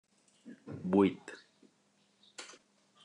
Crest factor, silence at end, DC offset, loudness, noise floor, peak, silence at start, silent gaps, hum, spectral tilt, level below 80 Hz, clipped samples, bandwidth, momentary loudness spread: 24 dB; 0.6 s; under 0.1%; -31 LUFS; -72 dBFS; -14 dBFS; 0.45 s; none; none; -7 dB/octave; -82 dBFS; under 0.1%; 10.5 kHz; 25 LU